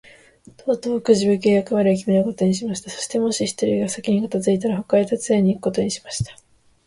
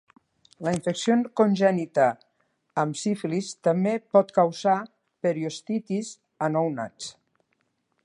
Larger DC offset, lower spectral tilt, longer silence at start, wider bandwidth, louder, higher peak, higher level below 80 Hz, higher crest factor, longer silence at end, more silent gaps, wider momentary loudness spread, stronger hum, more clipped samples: neither; about the same, -5.5 dB/octave vs -6 dB/octave; about the same, 0.65 s vs 0.6 s; about the same, 11.5 kHz vs 11.5 kHz; first, -20 LUFS vs -25 LUFS; first, -2 dBFS vs -6 dBFS; first, -52 dBFS vs -72 dBFS; about the same, 18 dB vs 20 dB; second, 0.55 s vs 0.95 s; neither; about the same, 9 LU vs 11 LU; neither; neither